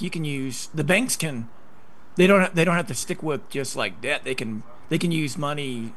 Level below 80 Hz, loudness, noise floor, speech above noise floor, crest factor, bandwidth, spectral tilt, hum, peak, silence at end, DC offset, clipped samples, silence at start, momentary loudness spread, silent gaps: -62 dBFS; -24 LUFS; -53 dBFS; 29 dB; 20 dB; 12.5 kHz; -4.5 dB/octave; none; -4 dBFS; 0.05 s; 2%; under 0.1%; 0 s; 12 LU; none